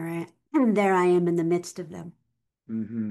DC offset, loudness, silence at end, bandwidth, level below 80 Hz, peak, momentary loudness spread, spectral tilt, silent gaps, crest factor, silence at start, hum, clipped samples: under 0.1%; -24 LUFS; 0 s; 12.5 kHz; -74 dBFS; -12 dBFS; 18 LU; -7 dB/octave; none; 14 dB; 0 s; none; under 0.1%